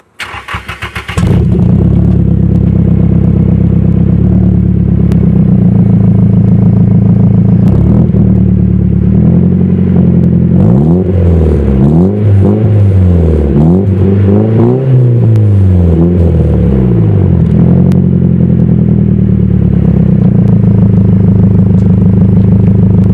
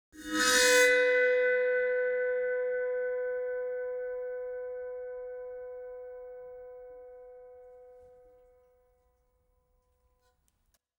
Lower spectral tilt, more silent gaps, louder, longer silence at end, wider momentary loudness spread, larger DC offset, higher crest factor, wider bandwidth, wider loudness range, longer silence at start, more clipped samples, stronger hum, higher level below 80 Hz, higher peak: first, -10.5 dB/octave vs 0 dB/octave; neither; first, -7 LUFS vs -28 LUFS; second, 0 s vs 2.9 s; second, 2 LU vs 24 LU; neither; second, 6 dB vs 20 dB; second, 4.6 kHz vs over 20 kHz; second, 1 LU vs 23 LU; about the same, 0.2 s vs 0.15 s; first, 0.3% vs under 0.1%; neither; first, -18 dBFS vs -68 dBFS; first, 0 dBFS vs -12 dBFS